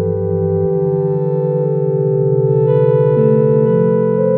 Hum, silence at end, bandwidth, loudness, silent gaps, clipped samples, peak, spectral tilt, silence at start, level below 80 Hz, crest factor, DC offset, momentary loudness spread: none; 0 s; 3.6 kHz; -14 LUFS; none; under 0.1%; -2 dBFS; -11.5 dB/octave; 0 s; -50 dBFS; 12 dB; under 0.1%; 4 LU